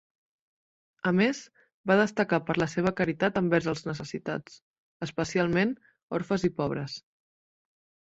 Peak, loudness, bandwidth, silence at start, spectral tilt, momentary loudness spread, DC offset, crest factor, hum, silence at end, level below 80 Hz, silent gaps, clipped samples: -8 dBFS; -28 LUFS; 8 kHz; 1.05 s; -6 dB/octave; 13 LU; under 0.1%; 22 dB; none; 1 s; -60 dBFS; 1.74-1.84 s, 4.62-5.00 s, 6.03-6.08 s; under 0.1%